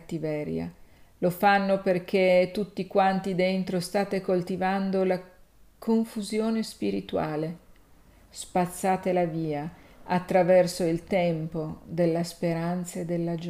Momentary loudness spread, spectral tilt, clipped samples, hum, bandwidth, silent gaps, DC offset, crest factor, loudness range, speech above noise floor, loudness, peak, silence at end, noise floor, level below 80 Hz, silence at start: 11 LU; -6 dB/octave; under 0.1%; none; 15.5 kHz; none; under 0.1%; 18 dB; 5 LU; 29 dB; -27 LUFS; -8 dBFS; 0 s; -55 dBFS; -58 dBFS; 0.05 s